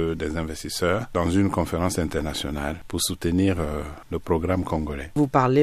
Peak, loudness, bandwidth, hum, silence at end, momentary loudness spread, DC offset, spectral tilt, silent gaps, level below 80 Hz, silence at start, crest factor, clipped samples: -4 dBFS; -25 LUFS; 15 kHz; none; 0 s; 8 LU; under 0.1%; -5.5 dB/octave; none; -38 dBFS; 0 s; 20 dB; under 0.1%